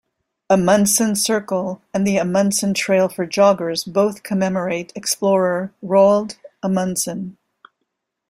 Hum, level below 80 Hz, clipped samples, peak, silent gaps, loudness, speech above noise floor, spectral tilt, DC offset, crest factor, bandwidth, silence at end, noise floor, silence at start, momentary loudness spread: none; -58 dBFS; under 0.1%; -2 dBFS; none; -18 LUFS; 58 dB; -4.5 dB/octave; under 0.1%; 16 dB; 16 kHz; 0.95 s; -76 dBFS; 0.5 s; 10 LU